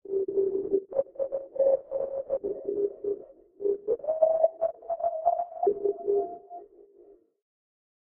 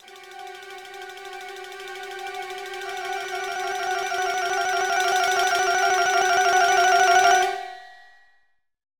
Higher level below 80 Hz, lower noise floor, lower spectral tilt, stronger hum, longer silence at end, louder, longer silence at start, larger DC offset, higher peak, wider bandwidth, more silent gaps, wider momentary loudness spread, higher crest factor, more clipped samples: about the same, -68 dBFS vs -64 dBFS; second, -57 dBFS vs -66 dBFS; first, -4.5 dB/octave vs 0 dB/octave; neither; first, 1.2 s vs 1.05 s; second, -29 LUFS vs -21 LUFS; about the same, 0.05 s vs 0.05 s; neither; second, -10 dBFS vs -6 dBFS; second, 2.1 kHz vs 19.5 kHz; neither; second, 9 LU vs 21 LU; about the same, 20 dB vs 18 dB; neither